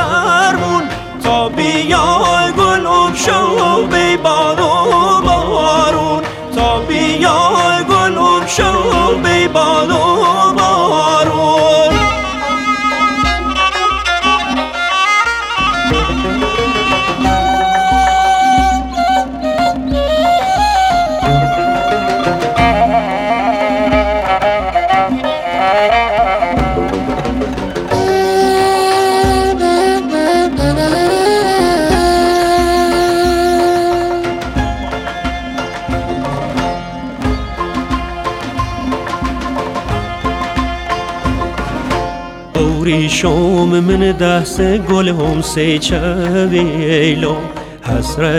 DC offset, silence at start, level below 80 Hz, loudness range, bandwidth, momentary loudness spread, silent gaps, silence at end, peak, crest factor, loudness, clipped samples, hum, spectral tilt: under 0.1%; 0 s; -28 dBFS; 7 LU; 16 kHz; 8 LU; none; 0 s; 0 dBFS; 12 dB; -13 LUFS; under 0.1%; none; -4.5 dB/octave